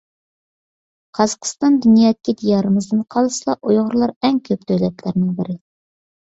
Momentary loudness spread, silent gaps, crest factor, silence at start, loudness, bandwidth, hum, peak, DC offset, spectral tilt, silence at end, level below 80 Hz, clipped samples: 8 LU; 4.16-4.21 s; 16 dB; 1.15 s; -17 LUFS; 8 kHz; none; -2 dBFS; under 0.1%; -6 dB/octave; 0.85 s; -58 dBFS; under 0.1%